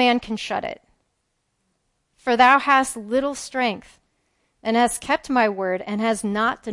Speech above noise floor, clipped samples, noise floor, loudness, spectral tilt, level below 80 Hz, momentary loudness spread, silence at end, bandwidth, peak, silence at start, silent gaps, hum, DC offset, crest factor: 52 dB; under 0.1%; -73 dBFS; -21 LUFS; -3.5 dB/octave; -56 dBFS; 13 LU; 0 s; 11.5 kHz; -2 dBFS; 0 s; none; none; under 0.1%; 20 dB